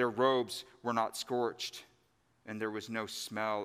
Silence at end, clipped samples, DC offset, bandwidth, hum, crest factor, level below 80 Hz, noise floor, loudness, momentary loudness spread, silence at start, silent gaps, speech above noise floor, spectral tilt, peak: 0 s; under 0.1%; under 0.1%; 15.5 kHz; none; 20 dB; -82 dBFS; -73 dBFS; -35 LUFS; 12 LU; 0 s; none; 38 dB; -4 dB/octave; -14 dBFS